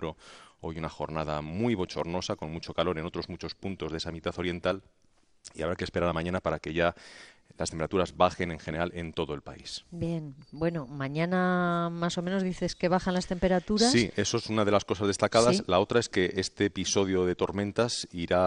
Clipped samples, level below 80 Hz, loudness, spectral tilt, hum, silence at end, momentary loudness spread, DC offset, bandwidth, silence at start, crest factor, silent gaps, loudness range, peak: under 0.1%; -52 dBFS; -29 LUFS; -5 dB/octave; none; 0 s; 12 LU; under 0.1%; 10.5 kHz; 0 s; 22 dB; none; 7 LU; -6 dBFS